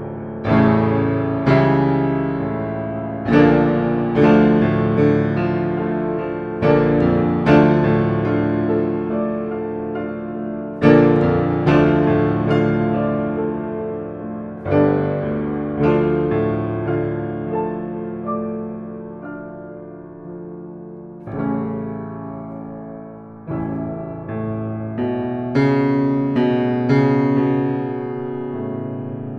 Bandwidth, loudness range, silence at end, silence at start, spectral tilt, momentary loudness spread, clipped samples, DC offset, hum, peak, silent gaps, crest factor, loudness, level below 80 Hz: 6.4 kHz; 12 LU; 0 s; 0 s; -9.5 dB/octave; 17 LU; under 0.1%; under 0.1%; none; 0 dBFS; none; 18 dB; -19 LUFS; -44 dBFS